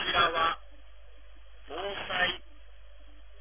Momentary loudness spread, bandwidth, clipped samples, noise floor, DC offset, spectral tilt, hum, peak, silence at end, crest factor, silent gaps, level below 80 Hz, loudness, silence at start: 15 LU; 3.7 kHz; under 0.1%; -53 dBFS; 0.5%; 0.5 dB/octave; none; -12 dBFS; 0 s; 22 dB; none; -52 dBFS; -29 LUFS; 0 s